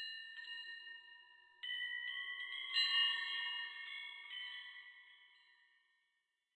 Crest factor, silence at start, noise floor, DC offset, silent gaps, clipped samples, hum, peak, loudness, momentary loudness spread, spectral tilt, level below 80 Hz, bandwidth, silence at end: 20 dB; 0 s; -86 dBFS; under 0.1%; none; under 0.1%; none; -24 dBFS; -40 LUFS; 21 LU; 4 dB/octave; under -90 dBFS; 9.4 kHz; 1.2 s